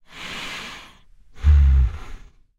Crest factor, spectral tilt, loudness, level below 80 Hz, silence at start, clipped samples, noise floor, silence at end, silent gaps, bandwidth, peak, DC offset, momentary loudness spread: 16 dB; -5.5 dB/octave; -20 LUFS; -22 dBFS; 0.15 s; under 0.1%; -48 dBFS; 0.45 s; none; 8 kHz; -6 dBFS; under 0.1%; 21 LU